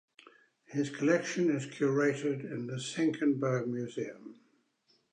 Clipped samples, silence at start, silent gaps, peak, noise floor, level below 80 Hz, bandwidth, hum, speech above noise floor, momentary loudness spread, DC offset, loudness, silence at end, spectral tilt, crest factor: under 0.1%; 0.7 s; none; -14 dBFS; -73 dBFS; -84 dBFS; 10 kHz; none; 41 dB; 11 LU; under 0.1%; -32 LUFS; 0.8 s; -6 dB/octave; 18 dB